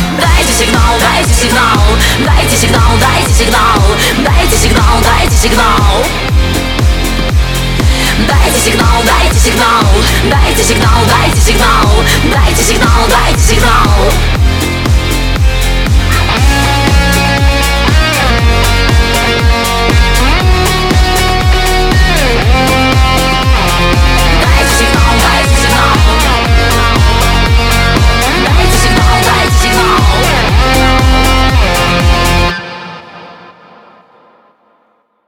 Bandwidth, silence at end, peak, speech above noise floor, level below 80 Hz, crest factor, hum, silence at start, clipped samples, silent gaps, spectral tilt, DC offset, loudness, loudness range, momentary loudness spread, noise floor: 18.5 kHz; 1.9 s; 0 dBFS; 47 dB; -12 dBFS; 8 dB; none; 0 s; under 0.1%; none; -4 dB/octave; under 0.1%; -8 LUFS; 2 LU; 3 LU; -54 dBFS